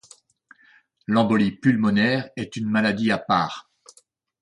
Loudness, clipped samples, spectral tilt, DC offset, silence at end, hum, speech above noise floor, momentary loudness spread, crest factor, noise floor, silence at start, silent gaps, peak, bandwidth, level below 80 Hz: -22 LUFS; under 0.1%; -6.5 dB/octave; under 0.1%; 0.8 s; none; 39 dB; 11 LU; 18 dB; -60 dBFS; 1.1 s; none; -6 dBFS; 10 kHz; -58 dBFS